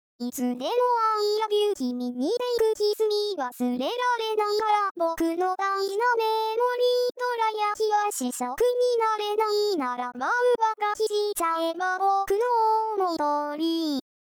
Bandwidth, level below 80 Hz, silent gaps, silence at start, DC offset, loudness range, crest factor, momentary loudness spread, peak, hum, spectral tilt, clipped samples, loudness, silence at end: over 20 kHz; -64 dBFS; 4.91-4.95 s; 0.2 s; under 0.1%; 1 LU; 12 dB; 6 LU; -12 dBFS; none; -2 dB/octave; under 0.1%; -25 LUFS; 0.4 s